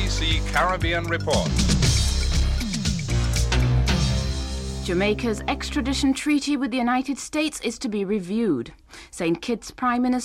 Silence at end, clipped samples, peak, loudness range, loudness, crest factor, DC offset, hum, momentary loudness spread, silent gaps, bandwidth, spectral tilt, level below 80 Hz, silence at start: 0 s; under 0.1%; -8 dBFS; 3 LU; -23 LUFS; 16 dB; under 0.1%; none; 7 LU; none; 15.5 kHz; -5 dB/octave; -28 dBFS; 0 s